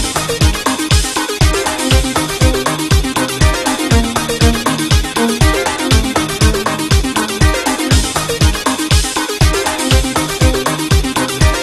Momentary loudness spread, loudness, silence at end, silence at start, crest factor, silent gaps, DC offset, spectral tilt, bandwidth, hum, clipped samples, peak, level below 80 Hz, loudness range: 3 LU; -14 LUFS; 0 s; 0 s; 14 dB; none; 0.1%; -4 dB/octave; 14 kHz; none; under 0.1%; 0 dBFS; -18 dBFS; 0 LU